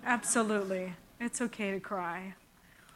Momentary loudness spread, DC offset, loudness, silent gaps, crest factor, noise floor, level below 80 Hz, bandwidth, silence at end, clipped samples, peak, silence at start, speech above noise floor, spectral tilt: 13 LU; under 0.1%; -34 LUFS; none; 22 dB; -60 dBFS; -70 dBFS; 16.5 kHz; 0.6 s; under 0.1%; -14 dBFS; 0 s; 27 dB; -3.5 dB/octave